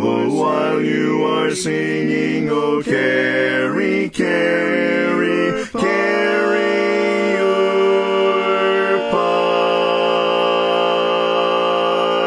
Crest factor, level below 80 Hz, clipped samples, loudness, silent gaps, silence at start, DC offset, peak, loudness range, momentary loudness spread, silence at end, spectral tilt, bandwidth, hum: 12 dB; -58 dBFS; under 0.1%; -17 LUFS; none; 0 s; under 0.1%; -4 dBFS; 1 LU; 3 LU; 0 s; -5 dB/octave; 10.5 kHz; none